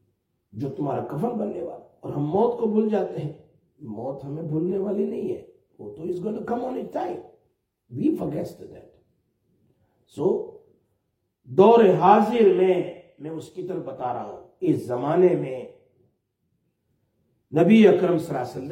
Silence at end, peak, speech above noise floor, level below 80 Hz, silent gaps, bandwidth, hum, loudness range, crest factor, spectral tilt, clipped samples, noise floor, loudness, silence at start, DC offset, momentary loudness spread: 0 s; -2 dBFS; 53 dB; -66 dBFS; none; 11 kHz; none; 11 LU; 22 dB; -8 dB/octave; under 0.1%; -75 dBFS; -23 LUFS; 0.55 s; under 0.1%; 21 LU